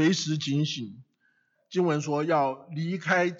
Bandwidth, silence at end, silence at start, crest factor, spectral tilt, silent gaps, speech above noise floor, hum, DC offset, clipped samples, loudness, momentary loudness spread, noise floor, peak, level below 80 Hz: 7.8 kHz; 0 s; 0 s; 16 dB; -5 dB/octave; none; 44 dB; none; under 0.1%; under 0.1%; -28 LUFS; 9 LU; -70 dBFS; -12 dBFS; -80 dBFS